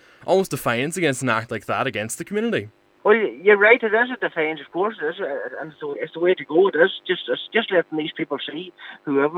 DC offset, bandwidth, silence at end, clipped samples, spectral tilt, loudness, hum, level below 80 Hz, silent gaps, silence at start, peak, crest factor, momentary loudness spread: under 0.1%; 19 kHz; 0 s; under 0.1%; -4.5 dB/octave; -21 LUFS; none; -66 dBFS; none; 0.2 s; 0 dBFS; 20 dB; 13 LU